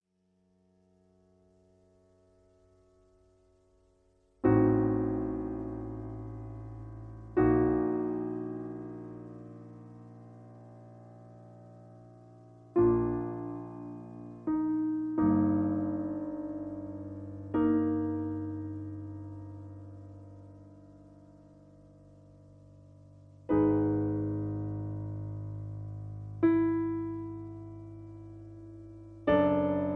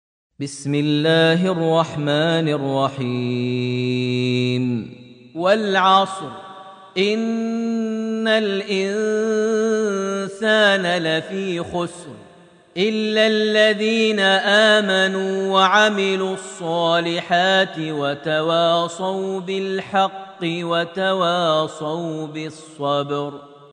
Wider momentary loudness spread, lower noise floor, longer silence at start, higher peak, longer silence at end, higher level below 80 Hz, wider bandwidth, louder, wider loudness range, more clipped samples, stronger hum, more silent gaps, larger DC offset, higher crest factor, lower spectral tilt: first, 25 LU vs 12 LU; first, -73 dBFS vs -48 dBFS; first, 4.45 s vs 0.4 s; second, -14 dBFS vs -2 dBFS; about the same, 0 s vs 0.05 s; first, -54 dBFS vs -66 dBFS; second, 3.7 kHz vs 10 kHz; second, -31 LUFS vs -19 LUFS; first, 15 LU vs 5 LU; neither; neither; neither; neither; about the same, 20 dB vs 18 dB; first, -11 dB/octave vs -5 dB/octave